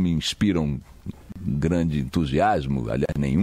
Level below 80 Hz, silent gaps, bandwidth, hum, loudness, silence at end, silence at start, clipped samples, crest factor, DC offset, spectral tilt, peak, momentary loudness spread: -38 dBFS; none; 14.5 kHz; none; -24 LUFS; 0 s; 0 s; under 0.1%; 14 dB; under 0.1%; -6.5 dB/octave; -10 dBFS; 13 LU